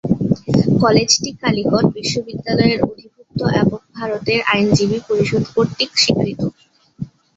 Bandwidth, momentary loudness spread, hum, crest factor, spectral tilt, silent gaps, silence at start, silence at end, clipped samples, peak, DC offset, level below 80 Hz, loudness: 8 kHz; 11 LU; none; 16 dB; -5 dB/octave; none; 0.05 s; 0.3 s; under 0.1%; 0 dBFS; under 0.1%; -46 dBFS; -17 LUFS